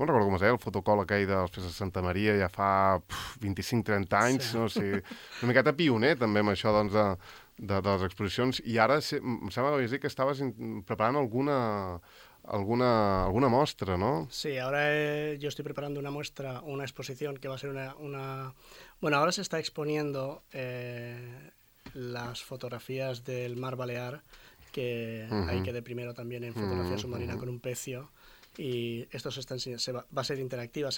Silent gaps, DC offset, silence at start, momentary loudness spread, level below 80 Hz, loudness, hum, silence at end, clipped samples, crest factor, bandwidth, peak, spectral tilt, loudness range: none; under 0.1%; 0 s; 14 LU; -56 dBFS; -31 LUFS; none; 0 s; under 0.1%; 22 dB; 17.5 kHz; -8 dBFS; -5.5 dB/octave; 10 LU